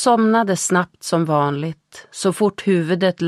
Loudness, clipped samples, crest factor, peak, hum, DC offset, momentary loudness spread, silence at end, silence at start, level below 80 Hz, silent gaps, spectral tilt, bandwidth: -19 LUFS; under 0.1%; 16 dB; -4 dBFS; none; under 0.1%; 11 LU; 0 s; 0 s; -64 dBFS; none; -5 dB/octave; 14.5 kHz